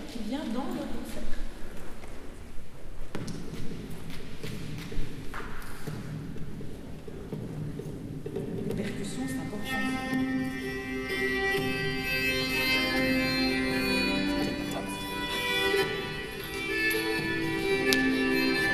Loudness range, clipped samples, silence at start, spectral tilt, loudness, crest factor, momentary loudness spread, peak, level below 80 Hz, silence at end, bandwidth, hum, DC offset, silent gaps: 14 LU; under 0.1%; 0 s; -4.5 dB/octave; -30 LUFS; 28 dB; 17 LU; -2 dBFS; -42 dBFS; 0 s; 15 kHz; none; under 0.1%; none